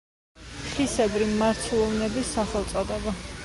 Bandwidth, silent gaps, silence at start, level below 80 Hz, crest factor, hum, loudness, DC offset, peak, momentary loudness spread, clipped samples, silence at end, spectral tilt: 11.5 kHz; none; 0.35 s; -42 dBFS; 14 dB; none; -26 LUFS; under 0.1%; -12 dBFS; 9 LU; under 0.1%; 0 s; -4.5 dB/octave